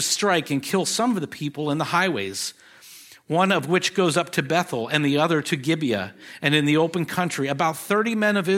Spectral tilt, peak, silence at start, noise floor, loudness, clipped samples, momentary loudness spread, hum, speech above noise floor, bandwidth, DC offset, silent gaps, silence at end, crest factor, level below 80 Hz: -4 dB/octave; -2 dBFS; 0 s; -47 dBFS; -22 LUFS; under 0.1%; 7 LU; none; 24 dB; 16.5 kHz; under 0.1%; none; 0 s; 20 dB; -70 dBFS